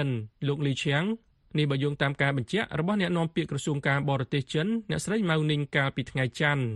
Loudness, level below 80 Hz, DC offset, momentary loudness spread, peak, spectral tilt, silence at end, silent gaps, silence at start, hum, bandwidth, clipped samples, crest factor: -28 LUFS; -58 dBFS; under 0.1%; 5 LU; -8 dBFS; -6 dB/octave; 0 s; none; 0 s; none; 11.5 kHz; under 0.1%; 18 dB